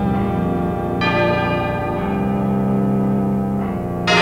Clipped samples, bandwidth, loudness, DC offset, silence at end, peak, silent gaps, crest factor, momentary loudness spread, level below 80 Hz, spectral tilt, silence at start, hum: under 0.1%; 14 kHz; -19 LUFS; under 0.1%; 0 s; -2 dBFS; none; 16 dB; 4 LU; -36 dBFS; -6.5 dB/octave; 0 s; none